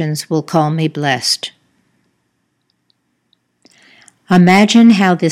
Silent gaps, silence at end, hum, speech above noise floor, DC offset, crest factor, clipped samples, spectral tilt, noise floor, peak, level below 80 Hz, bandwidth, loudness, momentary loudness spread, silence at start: none; 0 s; none; 54 dB; under 0.1%; 14 dB; 0.1%; -5.5 dB/octave; -66 dBFS; 0 dBFS; -60 dBFS; 14 kHz; -12 LUFS; 10 LU; 0 s